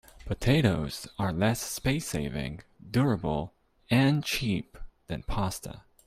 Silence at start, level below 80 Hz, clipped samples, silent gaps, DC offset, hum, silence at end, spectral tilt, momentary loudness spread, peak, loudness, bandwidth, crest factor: 0.15 s; -44 dBFS; under 0.1%; none; under 0.1%; none; 0.25 s; -5.5 dB/octave; 15 LU; -10 dBFS; -29 LUFS; 16 kHz; 20 dB